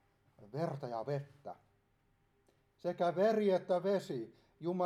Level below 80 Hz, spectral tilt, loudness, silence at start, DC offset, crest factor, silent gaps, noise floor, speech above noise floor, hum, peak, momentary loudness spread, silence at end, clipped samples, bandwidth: -80 dBFS; -7.5 dB/octave; -36 LUFS; 0.4 s; under 0.1%; 16 dB; none; -75 dBFS; 39 dB; none; -22 dBFS; 19 LU; 0 s; under 0.1%; 13.5 kHz